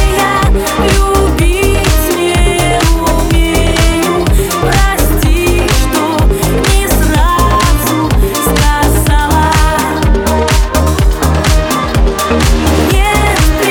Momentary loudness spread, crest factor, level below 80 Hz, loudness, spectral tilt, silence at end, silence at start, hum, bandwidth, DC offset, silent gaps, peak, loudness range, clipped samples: 2 LU; 10 dB; -12 dBFS; -10 LUFS; -4.5 dB/octave; 0 s; 0 s; none; 19.5 kHz; under 0.1%; none; 0 dBFS; 1 LU; under 0.1%